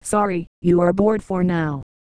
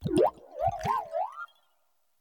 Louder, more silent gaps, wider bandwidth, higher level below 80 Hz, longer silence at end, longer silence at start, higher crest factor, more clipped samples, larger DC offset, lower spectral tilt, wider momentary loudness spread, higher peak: first, -20 LUFS vs -30 LUFS; first, 0.47-0.62 s vs none; second, 11 kHz vs 18 kHz; first, -46 dBFS vs -56 dBFS; second, 0.35 s vs 0.75 s; about the same, 0.05 s vs 0 s; about the same, 14 dB vs 18 dB; neither; neither; about the same, -7 dB/octave vs -6.5 dB/octave; second, 7 LU vs 15 LU; first, -4 dBFS vs -14 dBFS